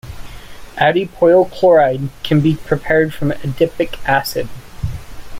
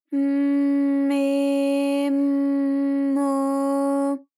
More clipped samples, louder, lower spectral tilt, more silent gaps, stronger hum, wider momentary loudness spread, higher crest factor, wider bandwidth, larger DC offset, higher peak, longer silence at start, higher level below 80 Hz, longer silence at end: neither; first, -15 LUFS vs -22 LUFS; first, -6.5 dB/octave vs -4.5 dB/octave; neither; neither; first, 17 LU vs 2 LU; first, 14 dB vs 8 dB; first, 16.5 kHz vs 12 kHz; neither; first, -2 dBFS vs -14 dBFS; about the same, 0.05 s vs 0.1 s; first, -36 dBFS vs under -90 dBFS; second, 0 s vs 0.2 s